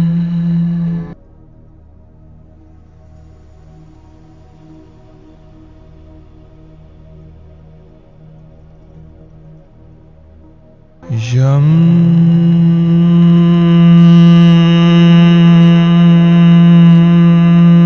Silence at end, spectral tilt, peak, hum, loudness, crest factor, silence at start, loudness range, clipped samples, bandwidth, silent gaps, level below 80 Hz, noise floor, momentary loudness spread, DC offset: 0 s; -9 dB/octave; 0 dBFS; none; -8 LUFS; 10 dB; 0 s; 16 LU; 0.1%; 6.4 kHz; none; -42 dBFS; -41 dBFS; 10 LU; under 0.1%